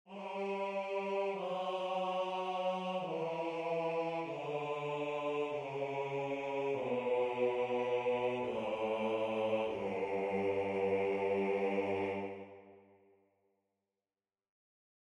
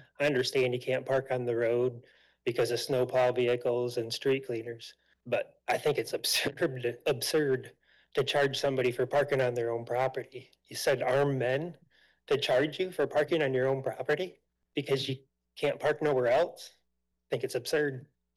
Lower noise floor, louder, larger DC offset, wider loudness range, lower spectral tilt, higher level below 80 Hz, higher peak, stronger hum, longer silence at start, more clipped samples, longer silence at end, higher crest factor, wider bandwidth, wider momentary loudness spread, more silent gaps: first, under -90 dBFS vs -81 dBFS; second, -37 LUFS vs -30 LUFS; neither; about the same, 3 LU vs 2 LU; first, -6.5 dB/octave vs -4.5 dB/octave; second, -78 dBFS vs -70 dBFS; about the same, -22 dBFS vs -20 dBFS; neither; second, 0.05 s vs 0.2 s; neither; first, 2.35 s vs 0.3 s; first, 16 dB vs 10 dB; second, 10 kHz vs 17.5 kHz; second, 5 LU vs 10 LU; neither